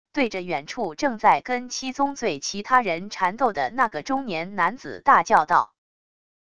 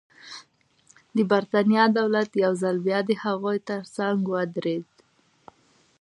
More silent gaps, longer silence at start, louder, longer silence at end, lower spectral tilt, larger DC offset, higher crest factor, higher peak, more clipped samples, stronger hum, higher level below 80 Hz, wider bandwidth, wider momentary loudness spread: neither; second, 0.05 s vs 0.25 s; about the same, -23 LUFS vs -24 LUFS; second, 0.65 s vs 1.2 s; second, -3.5 dB/octave vs -6.5 dB/octave; first, 0.5% vs under 0.1%; about the same, 20 dB vs 20 dB; about the same, -4 dBFS vs -6 dBFS; neither; neither; first, -58 dBFS vs -74 dBFS; about the same, 11 kHz vs 11 kHz; second, 10 LU vs 13 LU